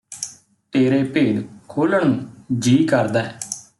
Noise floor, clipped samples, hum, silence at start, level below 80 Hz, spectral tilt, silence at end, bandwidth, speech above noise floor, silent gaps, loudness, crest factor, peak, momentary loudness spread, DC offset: -38 dBFS; under 0.1%; none; 0.1 s; -60 dBFS; -5.5 dB/octave; 0.2 s; 12 kHz; 20 dB; none; -19 LUFS; 16 dB; -4 dBFS; 13 LU; under 0.1%